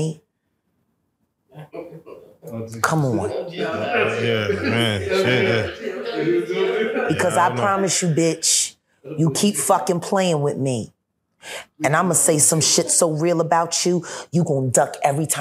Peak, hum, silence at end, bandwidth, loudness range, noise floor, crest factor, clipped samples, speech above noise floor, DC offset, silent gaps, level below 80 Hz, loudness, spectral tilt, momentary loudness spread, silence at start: -2 dBFS; none; 0 s; 16 kHz; 7 LU; -71 dBFS; 18 dB; under 0.1%; 52 dB; under 0.1%; none; -60 dBFS; -19 LUFS; -3.5 dB/octave; 13 LU; 0 s